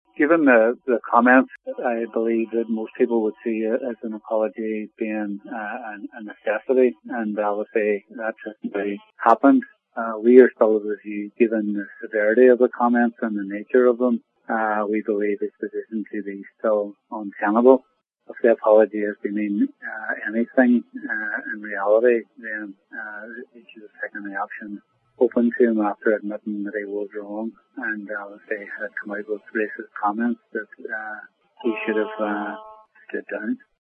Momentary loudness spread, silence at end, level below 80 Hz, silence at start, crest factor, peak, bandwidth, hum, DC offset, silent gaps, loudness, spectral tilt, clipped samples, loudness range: 16 LU; 0.3 s; -82 dBFS; 0.2 s; 22 dB; 0 dBFS; 3.8 kHz; none; under 0.1%; none; -22 LUFS; -9 dB/octave; under 0.1%; 9 LU